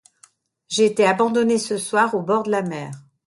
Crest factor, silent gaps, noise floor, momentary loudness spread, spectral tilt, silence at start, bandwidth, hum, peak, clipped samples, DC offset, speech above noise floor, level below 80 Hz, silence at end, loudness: 16 dB; none; -56 dBFS; 11 LU; -4 dB/octave; 0.7 s; 11.5 kHz; none; -4 dBFS; under 0.1%; under 0.1%; 37 dB; -68 dBFS; 0.25 s; -20 LUFS